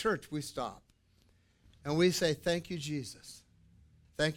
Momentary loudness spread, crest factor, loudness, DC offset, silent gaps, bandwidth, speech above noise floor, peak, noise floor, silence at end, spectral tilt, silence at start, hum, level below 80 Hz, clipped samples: 20 LU; 20 dB; -34 LUFS; under 0.1%; none; 17.5 kHz; 35 dB; -16 dBFS; -68 dBFS; 0 s; -4.5 dB/octave; 0 s; none; -62 dBFS; under 0.1%